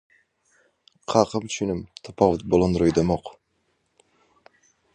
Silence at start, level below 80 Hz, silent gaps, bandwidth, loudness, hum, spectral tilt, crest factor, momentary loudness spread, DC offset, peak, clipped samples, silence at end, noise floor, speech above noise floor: 1.1 s; -46 dBFS; none; 10 kHz; -23 LUFS; none; -6 dB/octave; 24 dB; 17 LU; under 0.1%; -2 dBFS; under 0.1%; 1.65 s; -71 dBFS; 49 dB